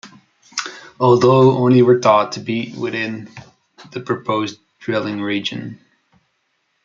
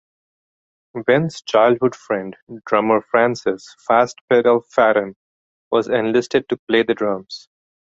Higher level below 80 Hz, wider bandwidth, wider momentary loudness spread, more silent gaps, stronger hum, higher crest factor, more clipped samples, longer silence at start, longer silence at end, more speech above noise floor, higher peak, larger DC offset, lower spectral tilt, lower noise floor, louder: about the same, -60 dBFS vs -62 dBFS; about the same, 7.6 kHz vs 8 kHz; first, 19 LU vs 13 LU; second, none vs 2.42-2.47 s, 4.21-4.28 s, 5.16-5.71 s, 6.59-6.67 s; neither; about the same, 16 dB vs 18 dB; neither; second, 0.05 s vs 0.95 s; first, 1.1 s vs 0.5 s; second, 52 dB vs over 72 dB; about the same, -2 dBFS vs -2 dBFS; neither; about the same, -6.5 dB/octave vs -5.5 dB/octave; second, -68 dBFS vs under -90 dBFS; about the same, -17 LUFS vs -18 LUFS